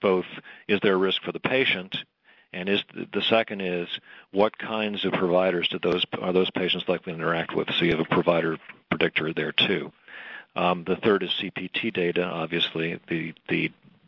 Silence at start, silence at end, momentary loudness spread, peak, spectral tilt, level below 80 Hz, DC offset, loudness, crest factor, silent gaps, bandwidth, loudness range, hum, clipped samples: 0 s; 0.35 s; 11 LU; -4 dBFS; -7.5 dB/octave; -64 dBFS; under 0.1%; -25 LUFS; 22 dB; none; 6 kHz; 2 LU; none; under 0.1%